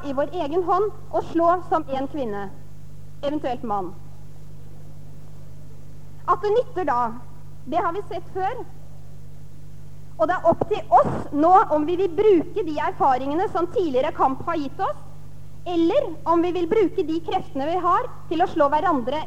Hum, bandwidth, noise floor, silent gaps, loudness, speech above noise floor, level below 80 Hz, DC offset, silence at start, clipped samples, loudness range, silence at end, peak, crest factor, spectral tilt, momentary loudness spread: 50 Hz at -45 dBFS; 15 kHz; -43 dBFS; none; -22 LUFS; 21 dB; -50 dBFS; 3%; 0 s; under 0.1%; 11 LU; 0 s; -4 dBFS; 18 dB; -7 dB/octave; 13 LU